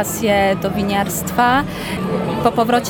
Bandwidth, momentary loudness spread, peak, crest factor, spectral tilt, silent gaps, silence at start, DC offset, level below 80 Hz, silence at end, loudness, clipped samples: 19.5 kHz; 6 LU; -2 dBFS; 16 dB; -4.5 dB/octave; none; 0 s; under 0.1%; -40 dBFS; 0 s; -17 LUFS; under 0.1%